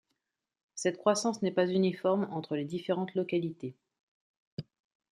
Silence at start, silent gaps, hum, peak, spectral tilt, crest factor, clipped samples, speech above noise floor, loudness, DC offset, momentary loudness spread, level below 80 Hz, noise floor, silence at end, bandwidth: 0.75 s; 4.00-4.57 s; none; -12 dBFS; -5.5 dB/octave; 22 dB; under 0.1%; 54 dB; -31 LUFS; under 0.1%; 17 LU; -78 dBFS; -85 dBFS; 0.55 s; 12 kHz